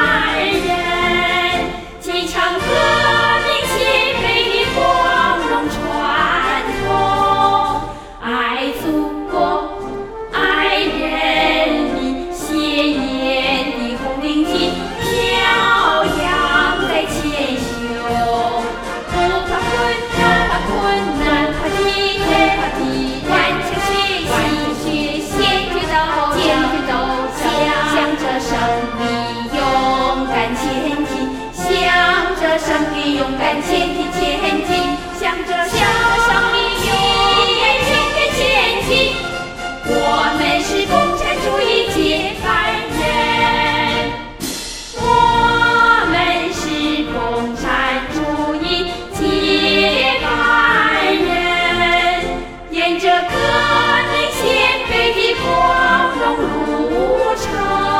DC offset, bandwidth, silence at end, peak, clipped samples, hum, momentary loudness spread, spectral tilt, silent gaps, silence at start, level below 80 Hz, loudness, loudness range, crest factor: under 0.1%; 17 kHz; 0 s; 0 dBFS; under 0.1%; none; 8 LU; -3.5 dB/octave; none; 0 s; -34 dBFS; -15 LUFS; 4 LU; 16 dB